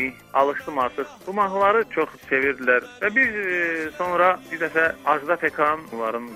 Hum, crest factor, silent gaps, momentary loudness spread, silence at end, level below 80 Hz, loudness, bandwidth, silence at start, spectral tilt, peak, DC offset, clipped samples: none; 18 dB; none; 7 LU; 0 s; -60 dBFS; -22 LUFS; 16 kHz; 0 s; -5 dB/octave; -4 dBFS; under 0.1%; under 0.1%